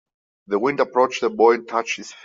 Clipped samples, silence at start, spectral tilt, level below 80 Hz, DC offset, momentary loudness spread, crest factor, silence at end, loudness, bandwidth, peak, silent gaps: under 0.1%; 0.5 s; -4 dB/octave; -70 dBFS; under 0.1%; 8 LU; 18 dB; 0.1 s; -20 LUFS; 7.6 kHz; -4 dBFS; none